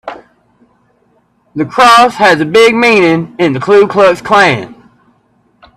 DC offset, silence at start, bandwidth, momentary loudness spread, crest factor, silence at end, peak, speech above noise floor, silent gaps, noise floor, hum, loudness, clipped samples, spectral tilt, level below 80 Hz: under 0.1%; 0.05 s; 15 kHz; 13 LU; 10 dB; 1.05 s; 0 dBFS; 46 dB; none; -54 dBFS; none; -8 LUFS; 0.2%; -4.5 dB/octave; -50 dBFS